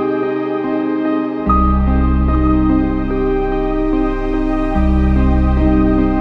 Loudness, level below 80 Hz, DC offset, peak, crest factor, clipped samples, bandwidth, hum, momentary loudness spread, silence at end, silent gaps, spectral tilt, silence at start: -16 LUFS; -18 dBFS; under 0.1%; -2 dBFS; 12 dB; under 0.1%; 5 kHz; none; 5 LU; 0 s; none; -10 dB/octave; 0 s